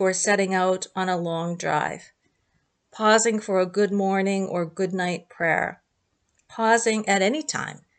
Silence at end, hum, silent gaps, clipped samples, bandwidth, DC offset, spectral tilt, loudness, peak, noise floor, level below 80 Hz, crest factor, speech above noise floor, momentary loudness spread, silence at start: 0.2 s; none; none; under 0.1%; 9.4 kHz; under 0.1%; -4 dB/octave; -23 LUFS; -6 dBFS; -73 dBFS; -70 dBFS; 18 dB; 49 dB; 9 LU; 0 s